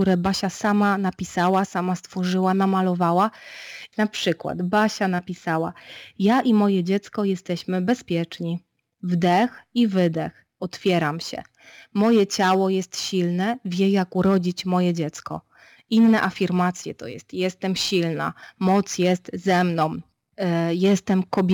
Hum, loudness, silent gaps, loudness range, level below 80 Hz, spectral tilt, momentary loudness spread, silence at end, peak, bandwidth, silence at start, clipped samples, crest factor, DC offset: none; -22 LUFS; none; 2 LU; -60 dBFS; -6 dB/octave; 13 LU; 0 s; -8 dBFS; 18 kHz; 0 s; under 0.1%; 16 dB; under 0.1%